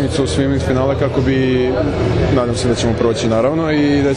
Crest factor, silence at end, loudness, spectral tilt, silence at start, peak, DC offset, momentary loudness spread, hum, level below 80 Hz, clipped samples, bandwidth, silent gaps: 14 dB; 0 s; -15 LUFS; -6.5 dB/octave; 0 s; -2 dBFS; under 0.1%; 2 LU; none; -30 dBFS; under 0.1%; 11 kHz; none